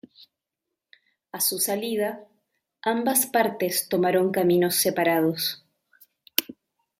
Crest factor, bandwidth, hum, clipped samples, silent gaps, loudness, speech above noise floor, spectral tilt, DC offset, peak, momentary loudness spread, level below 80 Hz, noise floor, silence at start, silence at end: 26 dB; 16 kHz; none; under 0.1%; none; -23 LUFS; 61 dB; -3.5 dB/octave; under 0.1%; 0 dBFS; 8 LU; -70 dBFS; -85 dBFS; 1.35 s; 0.5 s